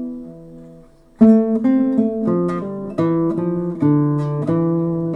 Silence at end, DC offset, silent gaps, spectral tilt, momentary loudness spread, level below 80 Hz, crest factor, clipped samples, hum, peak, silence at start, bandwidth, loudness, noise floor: 0 s; under 0.1%; none; -11 dB/octave; 12 LU; -52 dBFS; 16 dB; under 0.1%; none; -2 dBFS; 0 s; 4.2 kHz; -18 LUFS; -45 dBFS